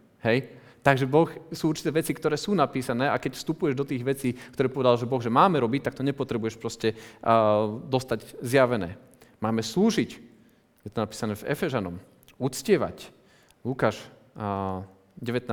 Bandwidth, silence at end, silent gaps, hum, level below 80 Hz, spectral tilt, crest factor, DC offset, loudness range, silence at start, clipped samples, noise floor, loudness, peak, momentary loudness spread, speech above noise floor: over 20 kHz; 0 s; none; none; -60 dBFS; -6 dB/octave; 24 dB; under 0.1%; 5 LU; 0.25 s; under 0.1%; -59 dBFS; -26 LUFS; -4 dBFS; 14 LU; 33 dB